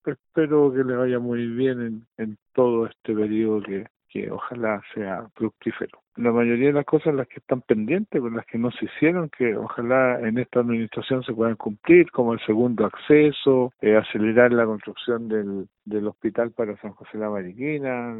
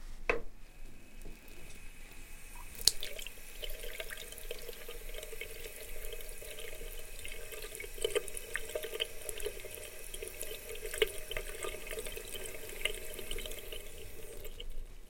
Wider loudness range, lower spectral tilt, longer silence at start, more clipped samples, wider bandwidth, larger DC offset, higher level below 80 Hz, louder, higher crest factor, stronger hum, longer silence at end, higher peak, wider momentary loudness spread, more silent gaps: about the same, 7 LU vs 7 LU; first, -11.5 dB/octave vs -1 dB/octave; about the same, 0.05 s vs 0 s; neither; second, 4.1 kHz vs 17 kHz; neither; second, -64 dBFS vs -46 dBFS; first, -23 LUFS vs -40 LUFS; second, 20 dB vs 34 dB; neither; about the same, 0 s vs 0 s; first, -2 dBFS vs -6 dBFS; second, 13 LU vs 17 LU; first, 2.42-2.46 s, 3.90-4.00 s vs none